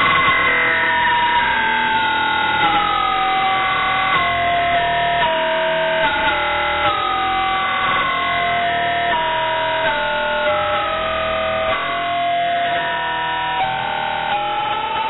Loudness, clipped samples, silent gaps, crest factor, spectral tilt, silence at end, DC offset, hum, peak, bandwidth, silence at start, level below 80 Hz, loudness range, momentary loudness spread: -17 LUFS; under 0.1%; none; 12 dB; -6.5 dB/octave; 0 s; under 0.1%; none; -6 dBFS; 4.1 kHz; 0 s; -44 dBFS; 3 LU; 5 LU